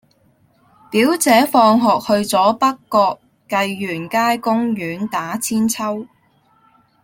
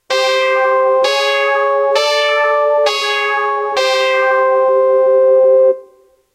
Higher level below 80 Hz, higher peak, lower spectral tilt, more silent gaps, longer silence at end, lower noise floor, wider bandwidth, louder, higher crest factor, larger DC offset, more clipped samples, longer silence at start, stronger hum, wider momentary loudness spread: first, -60 dBFS vs -68 dBFS; about the same, 0 dBFS vs -2 dBFS; first, -4 dB/octave vs 0 dB/octave; neither; first, 0.95 s vs 0.5 s; first, -57 dBFS vs -48 dBFS; first, 17 kHz vs 13 kHz; second, -17 LUFS vs -12 LUFS; about the same, 16 dB vs 12 dB; neither; neither; first, 0.9 s vs 0.1 s; neither; first, 10 LU vs 4 LU